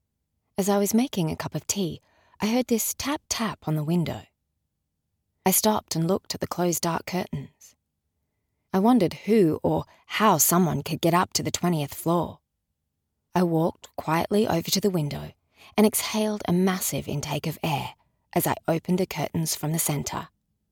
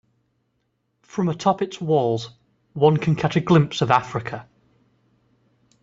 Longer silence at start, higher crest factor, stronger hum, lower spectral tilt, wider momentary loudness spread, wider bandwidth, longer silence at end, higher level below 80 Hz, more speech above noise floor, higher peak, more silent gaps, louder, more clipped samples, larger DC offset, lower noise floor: second, 0.6 s vs 1.15 s; about the same, 18 dB vs 22 dB; neither; second, -4.5 dB/octave vs -7 dB/octave; second, 10 LU vs 15 LU; first, over 20 kHz vs 7.8 kHz; second, 0.45 s vs 1.4 s; about the same, -56 dBFS vs -58 dBFS; first, 55 dB vs 51 dB; second, -8 dBFS vs -2 dBFS; neither; second, -25 LUFS vs -21 LUFS; neither; neither; first, -80 dBFS vs -72 dBFS